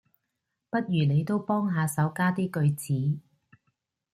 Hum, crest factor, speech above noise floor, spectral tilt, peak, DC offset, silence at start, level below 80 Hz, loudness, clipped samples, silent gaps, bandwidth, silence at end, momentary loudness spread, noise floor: none; 16 dB; 57 dB; -7 dB/octave; -12 dBFS; under 0.1%; 0.75 s; -66 dBFS; -27 LUFS; under 0.1%; none; 14.5 kHz; 0.95 s; 6 LU; -82 dBFS